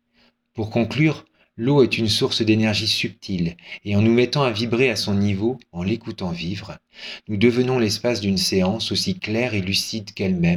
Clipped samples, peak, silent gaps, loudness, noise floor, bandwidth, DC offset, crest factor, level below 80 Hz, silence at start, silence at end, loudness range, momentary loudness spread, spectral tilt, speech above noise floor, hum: under 0.1%; -4 dBFS; none; -21 LUFS; -62 dBFS; 18 kHz; under 0.1%; 18 dB; -54 dBFS; 0.55 s; 0 s; 3 LU; 11 LU; -5 dB/octave; 41 dB; none